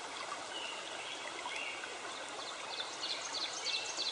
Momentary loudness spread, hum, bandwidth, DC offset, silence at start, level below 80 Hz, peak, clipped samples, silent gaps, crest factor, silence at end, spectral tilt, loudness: 7 LU; none; 10 kHz; under 0.1%; 0 s; -82 dBFS; -24 dBFS; under 0.1%; none; 18 dB; 0 s; 0.5 dB/octave; -39 LUFS